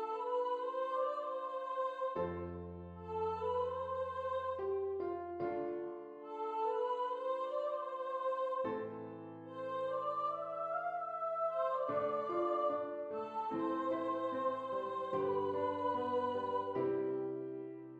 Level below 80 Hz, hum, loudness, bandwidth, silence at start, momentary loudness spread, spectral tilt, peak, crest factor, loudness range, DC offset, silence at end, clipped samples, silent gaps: -78 dBFS; none; -39 LUFS; 7.8 kHz; 0 s; 8 LU; -7.5 dB/octave; -24 dBFS; 14 dB; 3 LU; under 0.1%; 0 s; under 0.1%; none